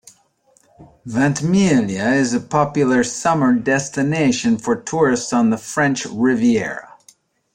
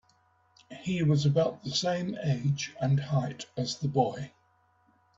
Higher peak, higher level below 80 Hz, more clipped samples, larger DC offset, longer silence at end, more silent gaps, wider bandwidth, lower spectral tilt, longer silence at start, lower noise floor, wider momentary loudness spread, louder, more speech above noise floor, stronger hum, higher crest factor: first, -2 dBFS vs -12 dBFS; first, -54 dBFS vs -64 dBFS; neither; neither; second, 0.7 s vs 0.9 s; neither; first, 10.5 kHz vs 7.8 kHz; about the same, -5 dB/octave vs -6 dB/octave; about the same, 0.8 s vs 0.7 s; second, -58 dBFS vs -68 dBFS; second, 4 LU vs 12 LU; first, -18 LUFS vs -29 LUFS; about the same, 41 dB vs 39 dB; neither; about the same, 16 dB vs 18 dB